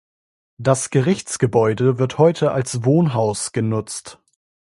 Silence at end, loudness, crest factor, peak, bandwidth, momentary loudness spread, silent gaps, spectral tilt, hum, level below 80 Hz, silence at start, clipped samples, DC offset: 0.55 s; -19 LUFS; 18 dB; 0 dBFS; 11.5 kHz; 7 LU; none; -6 dB/octave; none; -56 dBFS; 0.6 s; under 0.1%; under 0.1%